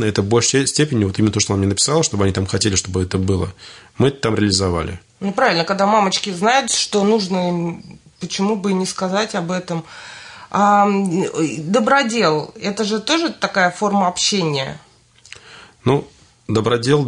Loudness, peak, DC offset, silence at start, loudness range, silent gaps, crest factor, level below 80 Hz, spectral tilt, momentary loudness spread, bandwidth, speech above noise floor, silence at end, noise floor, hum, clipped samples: -18 LUFS; -2 dBFS; under 0.1%; 0 s; 3 LU; none; 16 dB; -50 dBFS; -4 dB/octave; 12 LU; 11 kHz; 26 dB; 0 s; -44 dBFS; none; under 0.1%